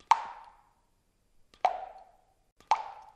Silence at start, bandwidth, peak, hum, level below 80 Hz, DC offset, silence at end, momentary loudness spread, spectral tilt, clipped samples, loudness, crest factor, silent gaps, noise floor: 0.1 s; 10 kHz; -8 dBFS; none; -70 dBFS; under 0.1%; 0.1 s; 18 LU; -0.5 dB/octave; under 0.1%; -32 LUFS; 28 dB; 2.52-2.56 s; -71 dBFS